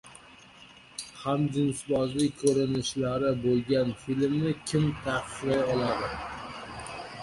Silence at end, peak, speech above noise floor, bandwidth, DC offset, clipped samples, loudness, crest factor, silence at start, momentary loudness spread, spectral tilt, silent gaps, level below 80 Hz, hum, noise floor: 0 s; -12 dBFS; 25 dB; 11.5 kHz; under 0.1%; under 0.1%; -28 LUFS; 18 dB; 0.05 s; 13 LU; -5.5 dB/octave; none; -54 dBFS; none; -52 dBFS